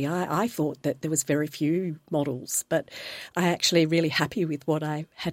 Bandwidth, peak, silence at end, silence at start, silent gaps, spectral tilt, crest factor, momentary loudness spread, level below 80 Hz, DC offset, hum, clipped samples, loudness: 16.5 kHz; -8 dBFS; 0 s; 0 s; none; -4.5 dB/octave; 20 dB; 9 LU; -66 dBFS; under 0.1%; none; under 0.1%; -26 LUFS